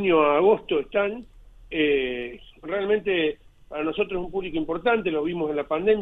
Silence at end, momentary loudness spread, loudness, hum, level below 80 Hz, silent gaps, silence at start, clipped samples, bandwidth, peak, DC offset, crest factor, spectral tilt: 0 s; 13 LU; -24 LUFS; none; -50 dBFS; none; 0 s; under 0.1%; 4 kHz; -8 dBFS; under 0.1%; 16 dB; -8 dB/octave